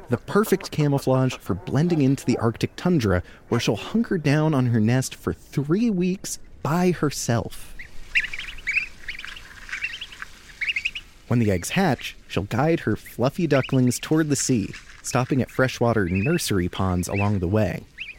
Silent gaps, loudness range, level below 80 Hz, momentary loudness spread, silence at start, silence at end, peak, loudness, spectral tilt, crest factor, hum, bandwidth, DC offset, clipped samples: none; 5 LU; -46 dBFS; 12 LU; 0 s; 0.05 s; -6 dBFS; -23 LUFS; -5.5 dB/octave; 18 dB; none; 17 kHz; under 0.1%; under 0.1%